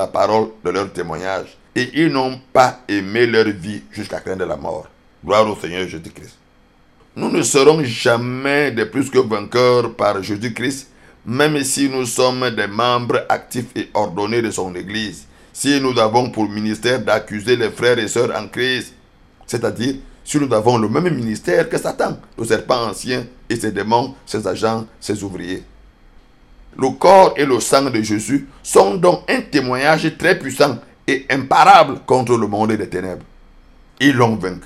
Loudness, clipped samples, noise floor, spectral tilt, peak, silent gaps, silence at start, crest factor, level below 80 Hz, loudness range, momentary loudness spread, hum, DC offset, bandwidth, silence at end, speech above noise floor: -17 LUFS; under 0.1%; -51 dBFS; -4.5 dB/octave; 0 dBFS; none; 0 s; 18 dB; -48 dBFS; 6 LU; 12 LU; none; under 0.1%; 15 kHz; 0 s; 35 dB